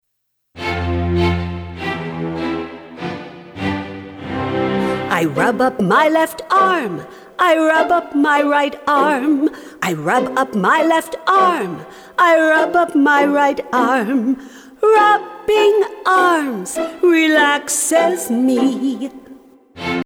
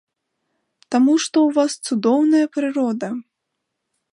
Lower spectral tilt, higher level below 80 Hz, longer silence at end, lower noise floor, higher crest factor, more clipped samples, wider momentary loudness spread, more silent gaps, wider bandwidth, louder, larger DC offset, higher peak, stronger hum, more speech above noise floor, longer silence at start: about the same, -4.5 dB/octave vs -4 dB/octave; first, -44 dBFS vs -76 dBFS; second, 0 s vs 0.95 s; second, -71 dBFS vs -78 dBFS; about the same, 14 dB vs 16 dB; neither; first, 14 LU vs 9 LU; neither; first, 19 kHz vs 11 kHz; about the same, -16 LUFS vs -18 LUFS; neither; about the same, -2 dBFS vs -4 dBFS; neither; second, 56 dB vs 60 dB; second, 0.55 s vs 0.9 s